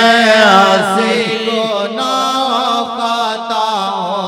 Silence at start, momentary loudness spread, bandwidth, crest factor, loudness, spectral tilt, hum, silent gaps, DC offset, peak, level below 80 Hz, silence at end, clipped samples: 0 s; 9 LU; 16.5 kHz; 12 dB; -12 LUFS; -3.5 dB/octave; none; none; under 0.1%; 0 dBFS; -60 dBFS; 0 s; 0.2%